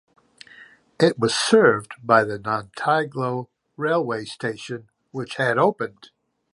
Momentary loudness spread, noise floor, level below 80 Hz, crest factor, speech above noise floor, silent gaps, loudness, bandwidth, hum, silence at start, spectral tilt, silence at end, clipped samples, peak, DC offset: 16 LU; -49 dBFS; -64 dBFS; 20 dB; 28 dB; none; -22 LUFS; 11.5 kHz; none; 0.6 s; -4.5 dB/octave; 0.65 s; under 0.1%; -2 dBFS; under 0.1%